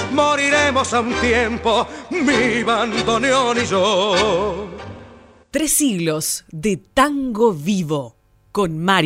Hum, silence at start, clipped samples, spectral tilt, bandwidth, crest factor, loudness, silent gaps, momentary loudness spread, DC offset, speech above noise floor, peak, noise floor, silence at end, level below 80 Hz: none; 0 s; under 0.1%; -3.5 dB/octave; 16 kHz; 16 dB; -18 LUFS; none; 9 LU; under 0.1%; 27 dB; -2 dBFS; -44 dBFS; 0 s; -44 dBFS